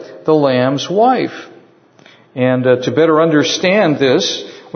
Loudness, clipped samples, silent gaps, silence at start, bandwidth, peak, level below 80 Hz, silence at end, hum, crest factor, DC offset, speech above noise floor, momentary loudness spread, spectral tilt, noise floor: -13 LUFS; under 0.1%; none; 0 s; 6.6 kHz; 0 dBFS; -62 dBFS; 0.15 s; none; 14 dB; under 0.1%; 33 dB; 8 LU; -5 dB/octave; -46 dBFS